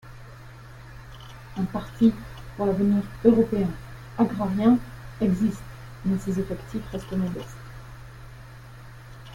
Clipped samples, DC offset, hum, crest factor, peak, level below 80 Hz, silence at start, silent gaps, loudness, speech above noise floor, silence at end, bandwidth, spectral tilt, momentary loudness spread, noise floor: under 0.1%; under 0.1%; none; 22 dB; -4 dBFS; -46 dBFS; 0.05 s; none; -25 LUFS; 20 dB; 0 s; 16.5 kHz; -8 dB/octave; 24 LU; -44 dBFS